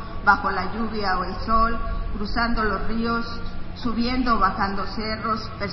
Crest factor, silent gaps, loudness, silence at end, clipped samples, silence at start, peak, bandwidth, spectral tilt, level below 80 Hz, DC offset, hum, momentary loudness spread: 20 dB; none; -24 LUFS; 0 s; under 0.1%; 0 s; -2 dBFS; 6 kHz; -7 dB/octave; -32 dBFS; under 0.1%; none; 10 LU